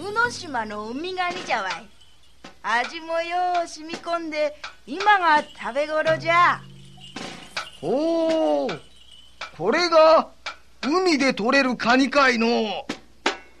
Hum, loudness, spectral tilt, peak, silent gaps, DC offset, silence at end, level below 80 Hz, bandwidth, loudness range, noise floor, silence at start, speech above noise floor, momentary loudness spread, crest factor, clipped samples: none; -22 LUFS; -3.5 dB/octave; -6 dBFS; none; 0.4%; 0.2 s; -58 dBFS; 12 kHz; 7 LU; -50 dBFS; 0 s; 29 dB; 16 LU; 18 dB; under 0.1%